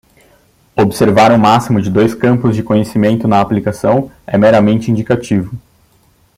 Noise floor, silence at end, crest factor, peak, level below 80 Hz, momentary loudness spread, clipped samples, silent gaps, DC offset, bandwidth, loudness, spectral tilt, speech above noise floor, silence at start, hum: -52 dBFS; 0.8 s; 12 dB; 0 dBFS; -44 dBFS; 9 LU; under 0.1%; none; under 0.1%; 15.5 kHz; -12 LUFS; -7 dB/octave; 41 dB; 0.75 s; none